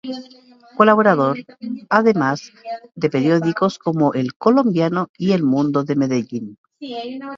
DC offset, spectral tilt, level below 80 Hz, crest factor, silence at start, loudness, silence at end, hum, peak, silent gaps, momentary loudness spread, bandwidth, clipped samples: under 0.1%; -7 dB/octave; -64 dBFS; 18 dB; 0.05 s; -18 LUFS; 0 s; none; 0 dBFS; 4.36-4.40 s, 5.09-5.14 s, 6.58-6.64 s; 17 LU; 7.4 kHz; under 0.1%